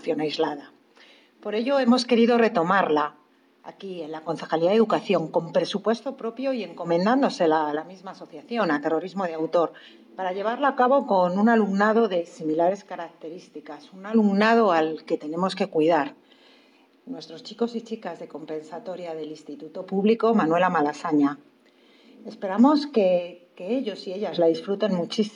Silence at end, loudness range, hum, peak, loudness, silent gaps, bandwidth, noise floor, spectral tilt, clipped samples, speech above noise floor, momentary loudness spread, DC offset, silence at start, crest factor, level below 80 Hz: 0.05 s; 5 LU; none; -8 dBFS; -23 LUFS; none; 10 kHz; -58 dBFS; -6.5 dB/octave; under 0.1%; 34 dB; 19 LU; under 0.1%; 0.05 s; 16 dB; -86 dBFS